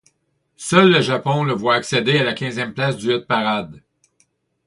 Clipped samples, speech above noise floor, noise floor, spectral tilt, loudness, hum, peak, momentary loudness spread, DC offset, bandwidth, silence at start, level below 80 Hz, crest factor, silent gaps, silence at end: under 0.1%; 50 dB; -67 dBFS; -5 dB/octave; -18 LUFS; none; 0 dBFS; 11 LU; under 0.1%; 11.5 kHz; 0.6 s; -58 dBFS; 20 dB; none; 0.9 s